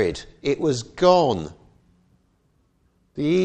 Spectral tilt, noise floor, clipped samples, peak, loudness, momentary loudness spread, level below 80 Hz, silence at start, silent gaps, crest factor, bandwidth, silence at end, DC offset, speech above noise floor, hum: -6 dB/octave; -64 dBFS; under 0.1%; -2 dBFS; -21 LUFS; 15 LU; -50 dBFS; 0 s; none; 20 dB; 9.2 kHz; 0 s; under 0.1%; 44 dB; none